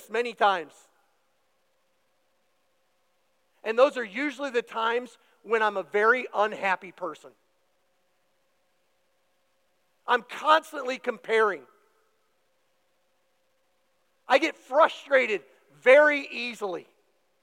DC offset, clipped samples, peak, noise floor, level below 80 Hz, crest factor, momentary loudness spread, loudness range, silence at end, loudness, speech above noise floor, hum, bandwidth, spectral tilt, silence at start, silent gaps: under 0.1%; under 0.1%; -6 dBFS; -73 dBFS; under -90 dBFS; 22 dB; 13 LU; 10 LU; 0.6 s; -25 LUFS; 48 dB; none; 16 kHz; -3 dB/octave; 0.1 s; none